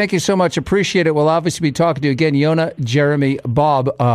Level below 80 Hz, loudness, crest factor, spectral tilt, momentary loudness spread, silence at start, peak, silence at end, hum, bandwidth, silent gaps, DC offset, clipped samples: -46 dBFS; -16 LUFS; 14 dB; -6 dB/octave; 3 LU; 0 s; -2 dBFS; 0 s; none; 14 kHz; none; under 0.1%; under 0.1%